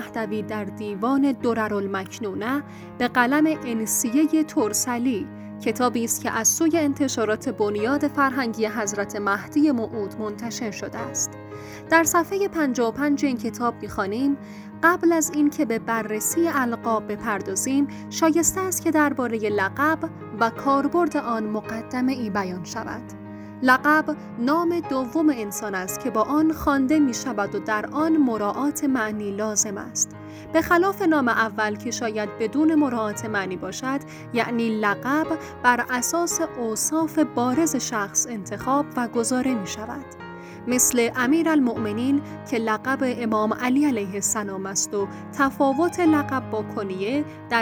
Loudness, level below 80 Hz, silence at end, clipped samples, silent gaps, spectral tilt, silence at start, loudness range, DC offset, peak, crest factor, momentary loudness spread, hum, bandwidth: -23 LUFS; -56 dBFS; 0 s; under 0.1%; none; -3.5 dB/octave; 0 s; 2 LU; under 0.1%; -4 dBFS; 20 dB; 10 LU; none; over 20 kHz